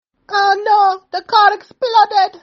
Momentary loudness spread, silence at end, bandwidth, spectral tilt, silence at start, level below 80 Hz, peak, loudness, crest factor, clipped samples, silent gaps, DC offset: 9 LU; 0.05 s; 6.8 kHz; 3 dB/octave; 0.3 s; -70 dBFS; 0 dBFS; -14 LUFS; 14 dB; under 0.1%; none; under 0.1%